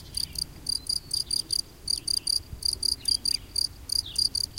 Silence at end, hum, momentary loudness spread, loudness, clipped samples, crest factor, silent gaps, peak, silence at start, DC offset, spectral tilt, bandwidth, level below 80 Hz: 0 s; none; 6 LU; -27 LUFS; under 0.1%; 20 dB; none; -10 dBFS; 0 s; under 0.1%; 0 dB/octave; 17 kHz; -48 dBFS